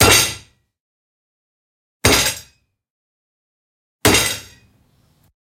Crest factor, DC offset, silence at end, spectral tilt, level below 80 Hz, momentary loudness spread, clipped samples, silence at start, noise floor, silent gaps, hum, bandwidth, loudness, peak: 22 dB; under 0.1%; 1.05 s; -2 dB/octave; -38 dBFS; 16 LU; under 0.1%; 0 s; -58 dBFS; 0.80-2.00 s, 2.90-3.99 s; none; 16.5 kHz; -15 LUFS; 0 dBFS